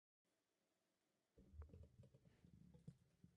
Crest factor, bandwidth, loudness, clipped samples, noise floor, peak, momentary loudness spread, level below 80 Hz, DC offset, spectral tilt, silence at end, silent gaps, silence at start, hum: 22 dB; 5.6 kHz; -66 LUFS; under 0.1%; under -90 dBFS; -48 dBFS; 5 LU; -72 dBFS; under 0.1%; -8.5 dB/octave; 0 s; none; 0.25 s; none